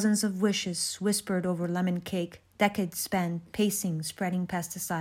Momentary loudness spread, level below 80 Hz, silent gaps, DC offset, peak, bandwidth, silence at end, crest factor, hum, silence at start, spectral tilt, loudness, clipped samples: 6 LU; -64 dBFS; none; under 0.1%; -10 dBFS; 16 kHz; 0 s; 18 dB; none; 0 s; -4.5 dB/octave; -30 LUFS; under 0.1%